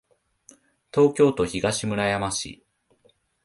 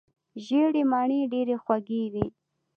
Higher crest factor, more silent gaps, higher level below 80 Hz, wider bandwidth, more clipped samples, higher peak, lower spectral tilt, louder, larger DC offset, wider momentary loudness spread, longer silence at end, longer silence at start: about the same, 20 dB vs 18 dB; neither; first, -52 dBFS vs -58 dBFS; first, 11.5 kHz vs 7 kHz; neither; first, -6 dBFS vs -10 dBFS; second, -4.5 dB/octave vs -8 dB/octave; first, -23 LUFS vs -26 LUFS; neither; about the same, 10 LU vs 10 LU; first, 0.9 s vs 0.5 s; first, 0.95 s vs 0.35 s